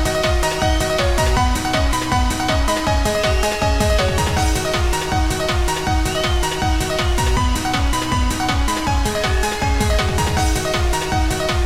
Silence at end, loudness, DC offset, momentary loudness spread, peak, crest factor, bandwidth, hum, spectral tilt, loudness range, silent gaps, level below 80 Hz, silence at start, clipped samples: 0 s; -18 LUFS; 1%; 2 LU; -2 dBFS; 14 dB; 16.5 kHz; none; -4 dB/octave; 1 LU; none; -22 dBFS; 0 s; under 0.1%